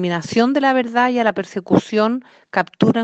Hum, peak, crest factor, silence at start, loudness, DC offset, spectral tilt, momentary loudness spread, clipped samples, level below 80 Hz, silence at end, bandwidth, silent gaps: none; 0 dBFS; 16 dB; 0 s; -18 LUFS; under 0.1%; -6 dB/octave; 7 LU; under 0.1%; -58 dBFS; 0 s; 8.4 kHz; none